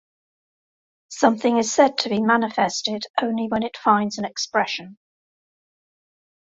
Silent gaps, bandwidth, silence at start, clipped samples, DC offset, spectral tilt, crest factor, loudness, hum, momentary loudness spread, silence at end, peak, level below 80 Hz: 3.10-3.14 s; 8 kHz; 1.1 s; under 0.1%; under 0.1%; -3.5 dB/octave; 20 dB; -21 LUFS; none; 8 LU; 1.55 s; -2 dBFS; -66 dBFS